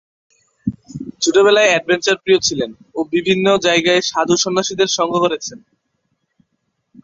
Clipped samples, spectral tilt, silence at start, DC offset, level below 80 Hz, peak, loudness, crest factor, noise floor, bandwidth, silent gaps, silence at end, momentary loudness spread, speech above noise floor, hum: under 0.1%; -3 dB/octave; 0.65 s; under 0.1%; -56 dBFS; -2 dBFS; -15 LUFS; 16 dB; -70 dBFS; 7.8 kHz; none; 1.45 s; 15 LU; 55 dB; none